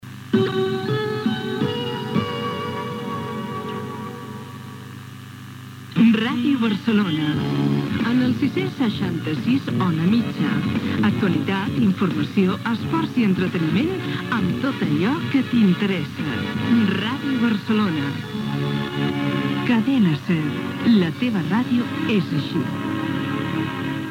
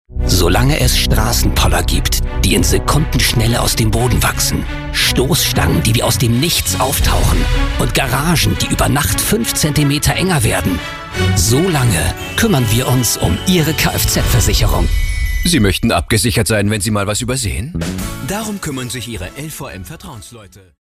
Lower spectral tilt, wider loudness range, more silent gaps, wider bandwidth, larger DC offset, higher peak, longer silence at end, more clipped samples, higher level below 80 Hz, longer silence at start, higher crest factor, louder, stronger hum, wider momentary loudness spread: first, -7 dB/octave vs -4 dB/octave; about the same, 5 LU vs 3 LU; neither; about the same, 16.5 kHz vs 15.5 kHz; neither; second, -6 dBFS vs -2 dBFS; second, 0 s vs 0.35 s; neither; second, -56 dBFS vs -20 dBFS; about the same, 0.05 s vs 0.1 s; about the same, 16 dB vs 12 dB; second, -22 LUFS vs -14 LUFS; neither; about the same, 10 LU vs 9 LU